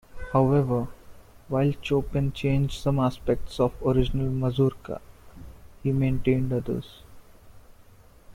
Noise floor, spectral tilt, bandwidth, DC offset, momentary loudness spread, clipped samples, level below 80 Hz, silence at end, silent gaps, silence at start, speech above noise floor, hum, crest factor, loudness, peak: -52 dBFS; -8 dB/octave; 14.5 kHz; under 0.1%; 9 LU; under 0.1%; -40 dBFS; 0 s; none; 0.15 s; 28 dB; none; 16 dB; -26 LUFS; -10 dBFS